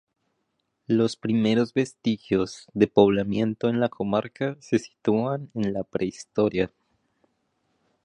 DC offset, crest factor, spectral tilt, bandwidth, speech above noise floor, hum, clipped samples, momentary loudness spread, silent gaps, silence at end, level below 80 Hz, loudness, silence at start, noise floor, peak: under 0.1%; 22 dB; -6.5 dB/octave; 10 kHz; 52 dB; none; under 0.1%; 8 LU; none; 1.4 s; -58 dBFS; -25 LUFS; 0.9 s; -76 dBFS; -4 dBFS